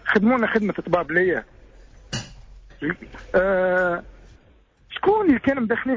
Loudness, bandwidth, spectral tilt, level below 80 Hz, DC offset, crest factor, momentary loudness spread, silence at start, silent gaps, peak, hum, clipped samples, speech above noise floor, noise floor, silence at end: -22 LUFS; 7.8 kHz; -6 dB/octave; -48 dBFS; under 0.1%; 16 dB; 14 LU; 0.05 s; none; -8 dBFS; none; under 0.1%; 35 dB; -55 dBFS; 0 s